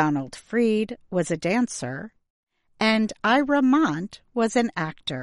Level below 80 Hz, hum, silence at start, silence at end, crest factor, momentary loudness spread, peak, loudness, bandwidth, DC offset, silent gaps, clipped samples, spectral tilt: -60 dBFS; none; 0 s; 0 s; 16 dB; 12 LU; -8 dBFS; -24 LUFS; 11.5 kHz; under 0.1%; 2.30-2.43 s; under 0.1%; -5 dB/octave